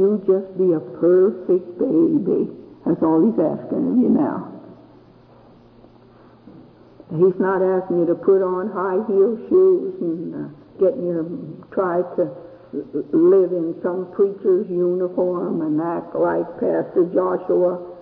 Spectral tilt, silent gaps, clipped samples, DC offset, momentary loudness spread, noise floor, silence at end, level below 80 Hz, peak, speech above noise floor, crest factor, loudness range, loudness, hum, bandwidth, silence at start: -12.5 dB/octave; none; under 0.1%; under 0.1%; 11 LU; -48 dBFS; 0 s; -62 dBFS; -6 dBFS; 29 dB; 12 dB; 6 LU; -20 LUFS; none; 2.9 kHz; 0 s